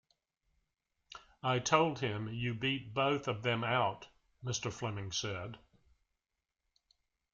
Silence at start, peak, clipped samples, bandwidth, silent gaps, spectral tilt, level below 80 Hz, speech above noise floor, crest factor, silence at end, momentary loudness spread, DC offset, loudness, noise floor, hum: 1.1 s; -12 dBFS; under 0.1%; 7.6 kHz; none; -4.5 dB/octave; -68 dBFS; 54 dB; 24 dB; 1.75 s; 17 LU; under 0.1%; -35 LUFS; -89 dBFS; none